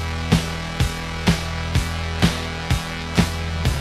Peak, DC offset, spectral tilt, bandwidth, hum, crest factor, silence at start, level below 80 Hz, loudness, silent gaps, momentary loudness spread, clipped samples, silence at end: -2 dBFS; under 0.1%; -5 dB/octave; 15 kHz; none; 20 dB; 0 s; -28 dBFS; -22 LUFS; none; 3 LU; under 0.1%; 0 s